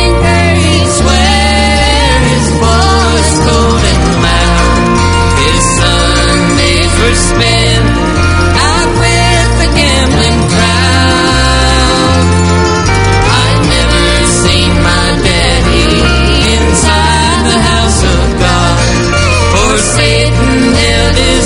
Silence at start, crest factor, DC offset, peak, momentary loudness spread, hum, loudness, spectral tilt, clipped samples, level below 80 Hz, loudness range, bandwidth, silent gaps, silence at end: 0 s; 8 dB; under 0.1%; 0 dBFS; 1 LU; none; -8 LUFS; -4 dB/octave; 0.6%; -14 dBFS; 0 LU; 11 kHz; none; 0 s